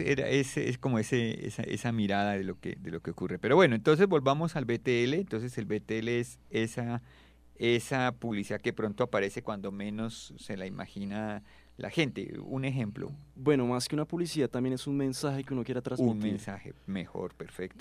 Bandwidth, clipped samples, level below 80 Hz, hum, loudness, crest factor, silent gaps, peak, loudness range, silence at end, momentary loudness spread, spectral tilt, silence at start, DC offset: 15 kHz; under 0.1%; -60 dBFS; none; -31 LUFS; 22 dB; none; -8 dBFS; 8 LU; 0 s; 13 LU; -6 dB/octave; 0 s; under 0.1%